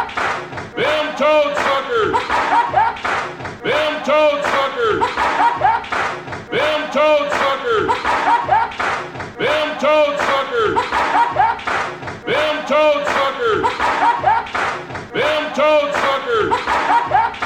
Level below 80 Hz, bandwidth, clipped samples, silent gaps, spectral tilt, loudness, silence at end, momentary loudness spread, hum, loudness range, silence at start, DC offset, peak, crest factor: -48 dBFS; 15.5 kHz; under 0.1%; none; -4 dB/octave; -17 LUFS; 0 s; 7 LU; none; 0 LU; 0 s; under 0.1%; -4 dBFS; 14 dB